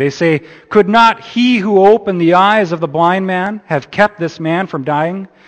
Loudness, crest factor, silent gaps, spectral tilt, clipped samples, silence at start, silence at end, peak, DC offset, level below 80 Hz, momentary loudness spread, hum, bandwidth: -13 LUFS; 12 dB; none; -6.5 dB/octave; 0.1%; 0 s; 0.2 s; 0 dBFS; under 0.1%; -54 dBFS; 9 LU; none; 8.8 kHz